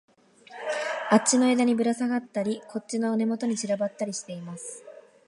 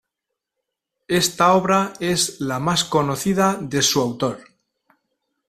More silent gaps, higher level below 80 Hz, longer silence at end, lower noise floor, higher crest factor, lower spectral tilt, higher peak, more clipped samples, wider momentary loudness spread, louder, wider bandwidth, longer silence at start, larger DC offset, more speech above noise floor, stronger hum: neither; second, -78 dBFS vs -54 dBFS; second, 0.25 s vs 1.1 s; second, -50 dBFS vs -82 dBFS; about the same, 20 dB vs 18 dB; about the same, -4 dB/octave vs -3.5 dB/octave; second, -6 dBFS vs -2 dBFS; neither; first, 17 LU vs 7 LU; second, -26 LUFS vs -19 LUFS; second, 11.5 kHz vs 15.5 kHz; second, 0.5 s vs 1.1 s; neither; second, 24 dB vs 63 dB; neither